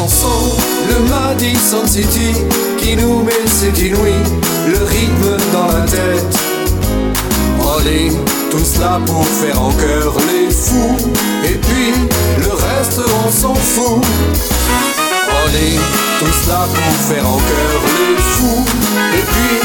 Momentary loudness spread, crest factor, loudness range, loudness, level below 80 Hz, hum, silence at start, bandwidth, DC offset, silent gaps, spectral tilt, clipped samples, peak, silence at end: 2 LU; 12 dB; 1 LU; -12 LUFS; -20 dBFS; none; 0 s; 19.5 kHz; under 0.1%; none; -4 dB/octave; under 0.1%; 0 dBFS; 0 s